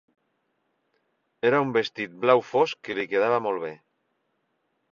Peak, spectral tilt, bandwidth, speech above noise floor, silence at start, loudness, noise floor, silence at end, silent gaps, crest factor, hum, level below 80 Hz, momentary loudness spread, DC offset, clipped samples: -4 dBFS; -6 dB/octave; 7.2 kHz; 51 dB; 1.45 s; -24 LUFS; -74 dBFS; 1.2 s; none; 24 dB; none; -72 dBFS; 10 LU; under 0.1%; under 0.1%